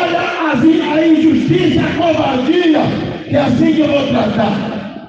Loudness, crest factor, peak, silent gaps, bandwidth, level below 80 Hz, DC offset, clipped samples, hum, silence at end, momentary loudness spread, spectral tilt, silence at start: -13 LUFS; 12 dB; 0 dBFS; none; 7.6 kHz; -44 dBFS; under 0.1%; under 0.1%; none; 0 s; 6 LU; -7 dB/octave; 0 s